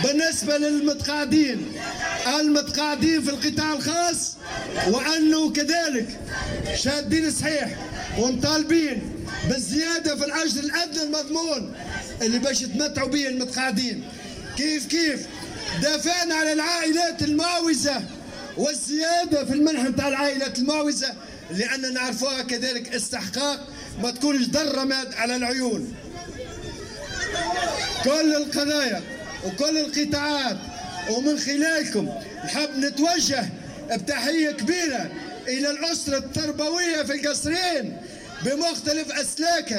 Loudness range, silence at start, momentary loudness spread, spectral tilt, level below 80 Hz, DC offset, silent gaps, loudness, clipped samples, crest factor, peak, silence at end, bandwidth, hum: 3 LU; 0 s; 11 LU; -3 dB/octave; -48 dBFS; under 0.1%; none; -24 LUFS; under 0.1%; 16 dB; -8 dBFS; 0 s; 16 kHz; none